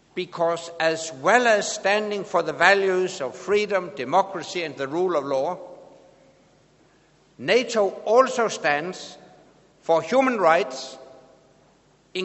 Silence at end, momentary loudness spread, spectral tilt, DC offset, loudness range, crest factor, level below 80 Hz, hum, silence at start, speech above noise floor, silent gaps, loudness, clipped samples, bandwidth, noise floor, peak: 0 s; 14 LU; -3.5 dB/octave; under 0.1%; 6 LU; 24 dB; -70 dBFS; none; 0.15 s; 36 dB; none; -22 LUFS; under 0.1%; 8.2 kHz; -59 dBFS; 0 dBFS